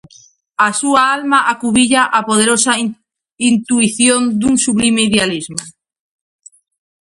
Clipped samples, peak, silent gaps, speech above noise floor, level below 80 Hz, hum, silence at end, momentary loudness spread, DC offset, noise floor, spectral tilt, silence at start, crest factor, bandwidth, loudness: under 0.1%; 0 dBFS; 3.33-3.37 s; 34 dB; -50 dBFS; none; 1.3 s; 7 LU; under 0.1%; -47 dBFS; -2.5 dB/octave; 0.6 s; 14 dB; 11.5 kHz; -13 LUFS